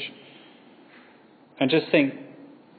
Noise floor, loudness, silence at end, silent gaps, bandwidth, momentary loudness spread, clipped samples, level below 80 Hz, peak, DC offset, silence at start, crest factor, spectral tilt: -54 dBFS; -23 LUFS; 0.35 s; none; 4.8 kHz; 25 LU; under 0.1%; -76 dBFS; -6 dBFS; under 0.1%; 0 s; 22 dB; -9 dB/octave